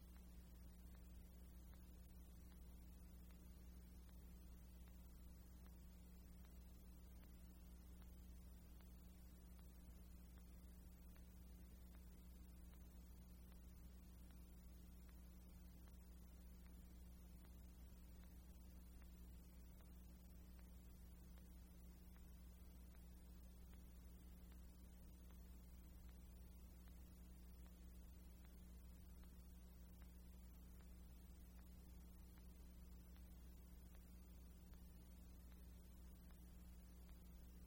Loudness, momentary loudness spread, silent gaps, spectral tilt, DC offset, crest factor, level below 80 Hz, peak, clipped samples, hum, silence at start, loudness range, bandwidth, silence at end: -64 LUFS; 1 LU; none; -6 dB/octave; under 0.1%; 12 dB; -62 dBFS; -48 dBFS; under 0.1%; none; 0 s; 0 LU; 16.5 kHz; 0 s